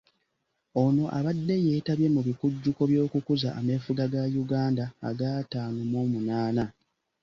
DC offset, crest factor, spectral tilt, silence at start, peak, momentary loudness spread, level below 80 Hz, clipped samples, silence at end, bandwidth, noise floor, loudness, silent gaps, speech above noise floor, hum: under 0.1%; 16 dB; -8.5 dB/octave; 0.75 s; -12 dBFS; 7 LU; -60 dBFS; under 0.1%; 0.5 s; 7.2 kHz; -78 dBFS; -28 LUFS; none; 52 dB; none